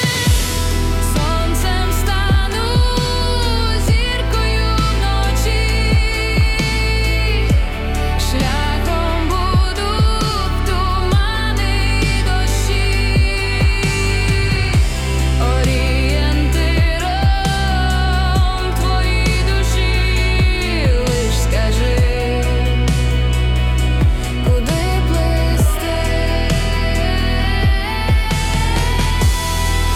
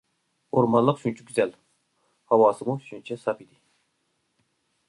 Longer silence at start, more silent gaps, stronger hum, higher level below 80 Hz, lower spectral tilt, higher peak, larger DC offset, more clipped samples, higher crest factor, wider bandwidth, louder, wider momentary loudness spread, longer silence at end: second, 0 s vs 0.55 s; neither; neither; first, -18 dBFS vs -68 dBFS; second, -5 dB/octave vs -7 dB/octave; about the same, -6 dBFS vs -6 dBFS; neither; neither; second, 10 dB vs 20 dB; first, 15.5 kHz vs 11.5 kHz; first, -17 LUFS vs -24 LUFS; second, 2 LU vs 12 LU; second, 0 s vs 1.45 s